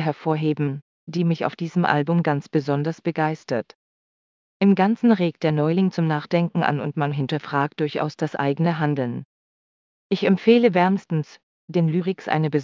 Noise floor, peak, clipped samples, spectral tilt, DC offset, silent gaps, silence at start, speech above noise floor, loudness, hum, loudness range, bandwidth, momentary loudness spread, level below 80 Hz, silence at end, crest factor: under -90 dBFS; -2 dBFS; under 0.1%; -8 dB/octave; under 0.1%; 0.82-1.07 s, 3.75-4.60 s, 9.25-10.10 s, 11.43-11.68 s; 0 s; over 69 dB; -22 LUFS; none; 3 LU; 7.4 kHz; 9 LU; -70 dBFS; 0 s; 20 dB